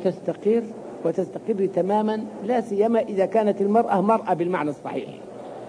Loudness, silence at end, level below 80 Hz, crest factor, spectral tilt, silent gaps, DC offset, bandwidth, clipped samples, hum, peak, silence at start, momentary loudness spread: -23 LUFS; 0 s; -70 dBFS; 16 dB; -8 dB/octave; none; under 0.1%; 10.5 kHz; under 0.1%; none; -8 dBFS; 0 s; 11 LU